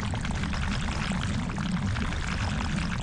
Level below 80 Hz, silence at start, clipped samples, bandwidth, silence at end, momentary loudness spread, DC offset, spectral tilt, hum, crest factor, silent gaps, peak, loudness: -34 dBFS; 0 s; under 0.1%; 11 kHz; 0 s; 1 LU; under 0.1%; -5 dB/octave; none; 14 dB; none; -14 dBFS; -30 LUFS